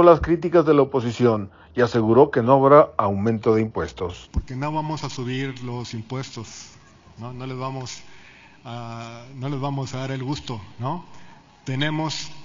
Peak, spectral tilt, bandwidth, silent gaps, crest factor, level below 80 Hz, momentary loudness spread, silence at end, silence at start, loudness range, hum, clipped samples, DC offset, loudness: 0 dBFS; -6.5 dB/octave; 7.6 kHz; none; 20 dB; -44 dBFS; 19 LU; 0 s; 0 s; 16 LU; none; under 0.1%; under 0.1%; -22 LUFS